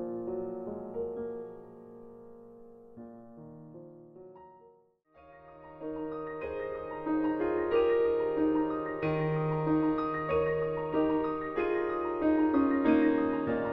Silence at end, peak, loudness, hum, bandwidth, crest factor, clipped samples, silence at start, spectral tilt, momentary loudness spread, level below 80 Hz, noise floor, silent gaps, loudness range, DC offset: 0 s; -14 dBFS; -31 LUFS; none; 5.2 kHz; 18 dB; under 0.1%; 0 s; -10 dB/octave; 24 LU; -58 dBFS; -63 dBFS; none; 22 LU; under 0.1%